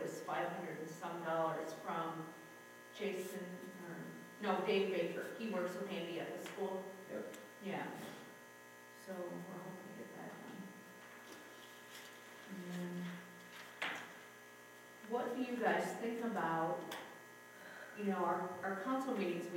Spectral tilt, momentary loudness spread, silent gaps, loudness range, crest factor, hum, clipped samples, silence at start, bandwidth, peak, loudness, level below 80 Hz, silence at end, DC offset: -5 dB/octave; 17 LU; none; 10 LU; 20 dB; 60 Hz at -70 dBFS; under 0.1%; 0 s; 16.5 kHz; -22 dBFS; -43 LUFS; under -90 dBFS; 0 s; under 0.1%